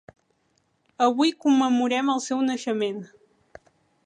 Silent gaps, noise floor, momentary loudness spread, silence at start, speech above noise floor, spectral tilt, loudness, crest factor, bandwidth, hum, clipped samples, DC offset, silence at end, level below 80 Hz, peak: none; -69 dBFS; 7 LU; 1 s; 47 dB; -3.5 dB/octave; -23 LUFS; 18 dB; 10 kHz; none; under 0.1%; under 0.1%; 1 s; -74 dBFS; -8 dBFS